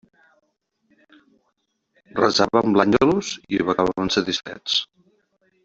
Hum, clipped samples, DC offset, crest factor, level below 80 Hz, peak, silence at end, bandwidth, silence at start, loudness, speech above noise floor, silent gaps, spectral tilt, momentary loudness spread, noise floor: none; under 0.1%; under 0.1%; 22 dB; -54 dBFS; 0 dBFS; 0.8 s; 8 kHz; 2.15 s; -20 LUFS; 52 dB; none; -4.5 dB/octave; 9 LU; -72 dBFS